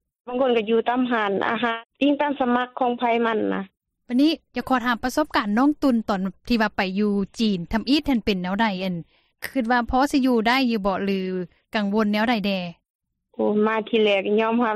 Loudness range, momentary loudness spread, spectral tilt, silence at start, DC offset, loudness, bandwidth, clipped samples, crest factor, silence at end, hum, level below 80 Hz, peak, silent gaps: 1 LU; 8 LU; -6 dB/octave; 0.25 s; under 0.1%; -22 LUFS; 14.5 kHz; under 0.1%; 14 dB; 0 s; none; -48 dBFS; -8 dBFS; 12.90-12.99 s